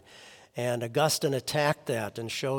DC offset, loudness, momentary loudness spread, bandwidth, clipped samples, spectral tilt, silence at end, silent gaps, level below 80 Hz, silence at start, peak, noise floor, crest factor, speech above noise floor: under 0.1%; -29 LUFS; 8 LU; 18 kHz; under 0.1%; -4 dB/octave; 0 s; none; -70 dBFS; 0.1 s; -10 dBFS; -52 dBFS; 20 dB; 24 dB